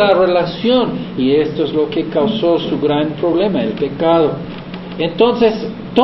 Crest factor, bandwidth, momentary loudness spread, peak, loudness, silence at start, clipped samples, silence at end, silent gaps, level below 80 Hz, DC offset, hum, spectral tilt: 14 dB; 6 kHz; 8 LU; 0 dBFS; -15 LUFS; 0 s; under 0.1%; 0 s; none; -44 dBFS; under 0.1%; none; -8.5 dB/octave